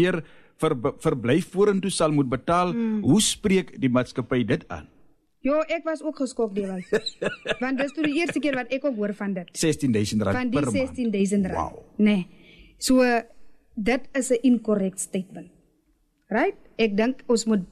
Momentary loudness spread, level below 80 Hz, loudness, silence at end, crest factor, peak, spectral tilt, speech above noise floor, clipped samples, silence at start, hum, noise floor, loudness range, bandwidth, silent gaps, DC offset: 9 LU; -52 dBFS; -24 LUFS; 0.05 s; 14 dB; -10 dBFS; -5 dB/octave; 43 dB; under 0.1%; 0 s; none; -67 dBFS; 4 LU; 13.5 kHz; none; under 0.1%